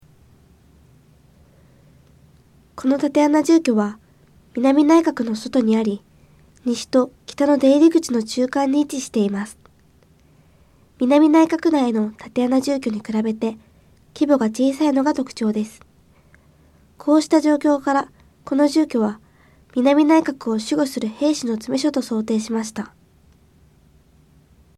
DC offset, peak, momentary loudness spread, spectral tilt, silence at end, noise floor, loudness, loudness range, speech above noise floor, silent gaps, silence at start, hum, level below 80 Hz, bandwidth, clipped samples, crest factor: under 0.1%; -4 dBFS; 11 LU; -5 dB/octave; 1.9 s; -54 dBFS; -19 LUFS; 4 LU; 36 dB; none; 2.75 s; none; -58 dBFS; 13 kHz; under 0.1%; 16 dB